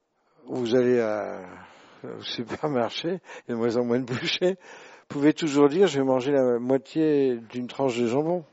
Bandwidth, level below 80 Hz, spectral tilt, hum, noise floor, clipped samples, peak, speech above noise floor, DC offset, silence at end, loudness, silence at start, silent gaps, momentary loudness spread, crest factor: 8 kHz; -70 dBFS; -4.5 dB/octave; none; -52 dBFS; under 0.1%; -6 dBFS; 27 dB; under 0.1%; 0.1 s; -25 LUFS; 0.45 s; none; 14 LU; 18 dB